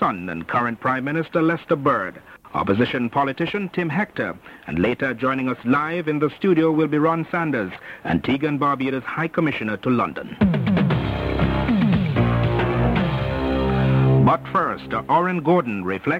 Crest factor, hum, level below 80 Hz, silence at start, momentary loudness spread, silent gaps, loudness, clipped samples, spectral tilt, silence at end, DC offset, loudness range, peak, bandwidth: 16 dB; none; -38 dBFS; 0 s; 6 LU; none; -21 LUFS; under 0.1%; -9 dB/octave; 0 s; under 0.1%; 3 LU; -6 dBFS; 6.4 kHz